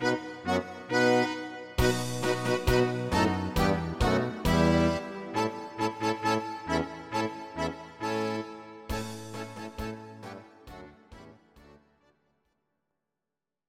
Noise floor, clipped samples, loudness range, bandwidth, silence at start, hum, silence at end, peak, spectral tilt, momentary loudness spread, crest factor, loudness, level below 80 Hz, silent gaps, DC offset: -90 dBFS; under 0.1%; 16 LU; 16 kHz; 0 s; none; 1.9 s; -10 dBFS; -5.5 dB/octave; 16 LU; 20 dB; -29 LUFS; -42 dBFS; none; under 0.1%